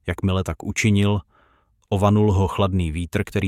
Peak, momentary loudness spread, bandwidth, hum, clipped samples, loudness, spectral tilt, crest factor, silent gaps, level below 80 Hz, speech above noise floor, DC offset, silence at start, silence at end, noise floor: -4 dBFS; 8 LU; 14 kHz; none; under 0.1%; -21 LUFS; -6.5 dB/octave; 16 dB; none; -40 dBFS; 41 dB; under 0.1%; 0.05 s; 0 s; -61 dBFS